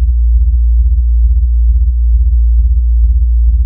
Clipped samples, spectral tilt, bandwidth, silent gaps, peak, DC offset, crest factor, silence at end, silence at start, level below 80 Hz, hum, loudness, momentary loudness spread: under 0.1%; -14 dB/octave; 0.2 kHz; none; -2 dBFS; under 0.1%; 6 dB; 0 s; 0 s; -8 dBFS; none; -12 LUFS; 1 LU